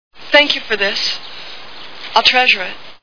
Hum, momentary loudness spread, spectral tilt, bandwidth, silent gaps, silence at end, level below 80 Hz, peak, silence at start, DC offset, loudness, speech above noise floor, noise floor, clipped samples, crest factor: none; 21 LU; -1 dB/octave; 5.4 kHz; none; 0 s; -54 dBFS; 0 dBFS; 0.1 s; 2%; -13 LUFS; 19 dB; -35 dBFS; 0.1%; 16 dB